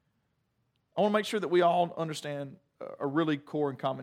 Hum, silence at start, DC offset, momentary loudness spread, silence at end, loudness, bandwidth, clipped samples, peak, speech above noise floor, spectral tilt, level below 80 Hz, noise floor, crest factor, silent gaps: none; 0.95 s; under 0.1%; 14 LU; 0 s; -30 LUFS; 15 kHz; under 0.1%; -14 dBFS; 47 dB; -6 dB/octave; -84 dBFS; -76 dBFS; 18 dB; none